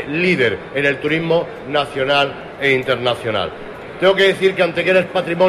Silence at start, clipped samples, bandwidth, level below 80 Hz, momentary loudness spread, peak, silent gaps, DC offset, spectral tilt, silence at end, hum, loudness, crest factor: 0 s; under 0.1%; 13 kHz; -50 dBFS; 7 LU; -2 dBFS; none; under 0.1%; -5.5 dB/octave; 0 s; none; -17 LUFS; 16 dB